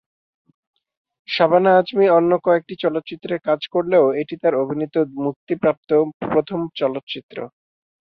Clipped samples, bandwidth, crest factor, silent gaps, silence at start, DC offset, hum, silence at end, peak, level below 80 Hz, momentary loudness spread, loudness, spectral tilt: under 0.1%; 6 kHz; 18 dB; 5.36-5.47 s, 5.77-5.83 s, 6.14-6.20 s, 7.03-7.07 s, 7.23-7.29 s; 1.3 s; under 0.1%; none; 0.55 s; -2 dBFS; -64 dBFS; 12 LU; -19 LUFS; -8.5 dB/octave